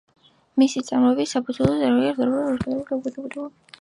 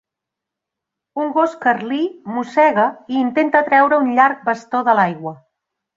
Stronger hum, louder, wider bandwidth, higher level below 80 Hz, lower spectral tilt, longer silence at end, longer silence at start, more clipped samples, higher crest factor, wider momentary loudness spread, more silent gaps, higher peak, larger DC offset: neither; second, -22 LUFS vs -16 LUFS; first, 11 kHz vs 7.6 kHz; first, -50 dBFS vs -68 dBFS; about the same, -6 dB/octave vs -6.5 dB/octave; second, 0.3 s vs 0.6 s; second, 0.55 s vs 1.15 s; neither; about the same, 18 dB vs 18 dB; about the same, 13 LU vs 11 LU; neither; second, -4 dBFS vs 0 dBFS; neither